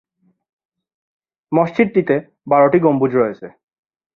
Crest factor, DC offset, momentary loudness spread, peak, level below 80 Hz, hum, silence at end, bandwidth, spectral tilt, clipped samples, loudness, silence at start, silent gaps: 16 dB; under 0.1%; 8 LU; -2 dBFS; -60 dBFS; none; 0.65 s; 6.6 kHz; -10 dB/octave; under 0.1%; -16 LUFS; 1.5 s; none